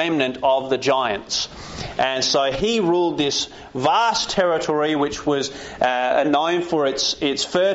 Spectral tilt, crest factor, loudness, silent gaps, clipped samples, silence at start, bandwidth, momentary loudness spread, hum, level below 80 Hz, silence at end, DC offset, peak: -2 dB/octave; 16 dB; -20 LUFS; none; under 0.1%; 0 s; 8 kHz; 6 LU; none; -48 dBFS; 0 s; under 0.1%; -6 dBFS